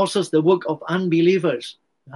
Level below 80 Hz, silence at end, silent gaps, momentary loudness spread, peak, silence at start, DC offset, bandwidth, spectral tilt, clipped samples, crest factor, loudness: -68 dBFS; 0 s; none; 9 LU; -6 dBFS; 0 s; under 0.1%; 11.5 kHz; -6 dB/octave; under 0.1%; 14 dB; -20 LUFS